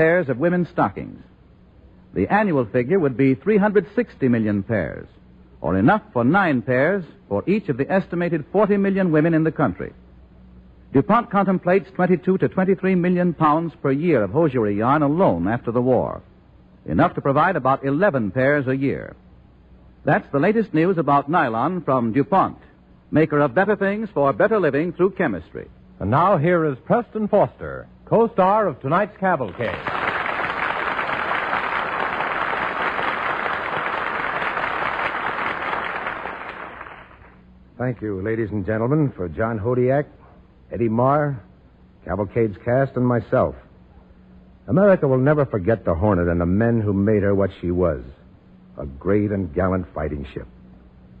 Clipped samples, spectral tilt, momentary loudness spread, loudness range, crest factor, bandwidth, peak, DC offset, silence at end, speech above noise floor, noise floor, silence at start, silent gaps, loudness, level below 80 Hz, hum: under 0.1%; -9.5 dB/octave; 10 LU; 5 LU; 14 dB; 5.2 kHz; -6 dBFS; under 0.1%; 0.75 s; 30 dB; -50 dBFS; 0 s; none; -20 LUFS; -46 dBFS; none